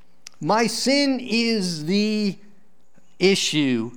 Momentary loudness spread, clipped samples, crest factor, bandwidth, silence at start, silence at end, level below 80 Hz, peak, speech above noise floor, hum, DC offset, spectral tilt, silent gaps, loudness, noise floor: 6 LU; under 0.1%; 16 dB; 19.5 kHz; 0.4 s; 0 s; -74 dBFS; -6 dBFS; 40 dB; none; 0.8%; -4 dB/octave; none; -21 LUFS; -61 dBFS